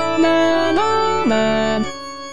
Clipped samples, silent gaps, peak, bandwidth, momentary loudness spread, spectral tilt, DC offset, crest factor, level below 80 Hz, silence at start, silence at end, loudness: under 0.1%; none; -6 dBFS; 10.5 kHz; 8 LU; -4.5 dB/octave; 3%; 12 dB; -44 dBFS; 0 s; 0 s; -17 LUFS